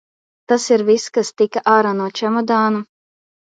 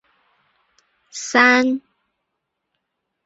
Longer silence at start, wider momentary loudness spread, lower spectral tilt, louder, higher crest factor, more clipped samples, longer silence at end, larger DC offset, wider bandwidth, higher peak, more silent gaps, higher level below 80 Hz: second, 0.5 s vs 1.15 s; second, 6 LU vs 18 LU; first, -4.5 dB/octave vs -1.5 dB/octave; about the same, -17 LUFS vs -16 LUFS; about the same, 18 dB vs 22 dB; neither; second, 0.7 s vs 1.45 s; neither; first, 9.4 kHz vs 8 kHz; about the same, 0 dBFS vs -2 dBFS; neither; about the same, -70 dBFS vs -70 dBFS